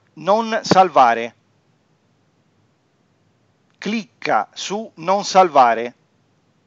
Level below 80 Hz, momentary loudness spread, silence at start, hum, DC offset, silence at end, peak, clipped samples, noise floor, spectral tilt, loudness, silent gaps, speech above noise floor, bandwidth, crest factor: -70 dBFS; 13 LU; 0.15 s; none; under 0.1%; 0.75 s; 0 dBFS; under 0.1%; -62 dBFS; -4 dB/octave; -17 LUFS; none; 45 dB; 7.8 kHz; 20 dB